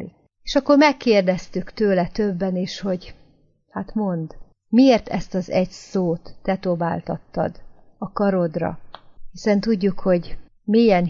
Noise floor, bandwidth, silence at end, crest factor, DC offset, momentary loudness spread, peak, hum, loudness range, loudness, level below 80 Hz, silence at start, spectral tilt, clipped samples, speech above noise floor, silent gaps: -58 dBFS; 7.6 kHz; 0 s; 18 dB; under 0.1%; 15 LU; -4 dBFS; none; 5 LU; -21 LUFS; -44 dBFS; 0 s; -7 dB/octave; under 0.1%; 38 dB; none